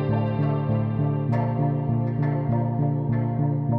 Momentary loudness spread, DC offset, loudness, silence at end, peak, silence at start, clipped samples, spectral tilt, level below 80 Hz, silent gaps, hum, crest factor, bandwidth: 1 LU; under 0.1%; -24 LUFS; 0 s; -12 dBFS; 0 s; under 0.1%; -12 dB/octave; -50 dBFS; none; none; 10 dB; 4.3 kHz